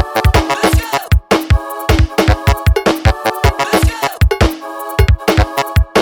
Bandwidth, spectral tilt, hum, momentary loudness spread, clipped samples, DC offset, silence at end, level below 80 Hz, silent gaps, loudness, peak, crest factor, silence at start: 18 kHz; -5.5 dB/octave; none; 3 LU; under 0.1%; under 0.1%; 0 s; -18 dBFS; none; -14 LUFS; 0 dBFS; 12 dB; 0 s